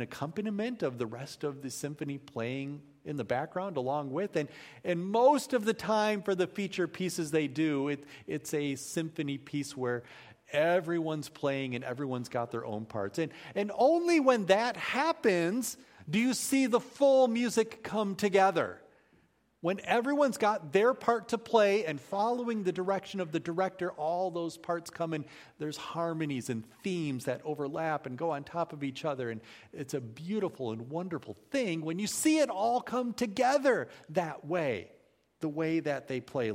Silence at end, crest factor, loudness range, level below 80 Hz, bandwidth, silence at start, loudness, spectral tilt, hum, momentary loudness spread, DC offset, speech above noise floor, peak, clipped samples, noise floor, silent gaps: 0 s; 22 dB; 7 LU; -74 dBFS; 16 kHz; 0 s; -32 LUFS; -5 dB/octave; none; 12 LU; under 0.1%; 37 dB; -10 dBFS; under 0.1%; -68 dBFS; none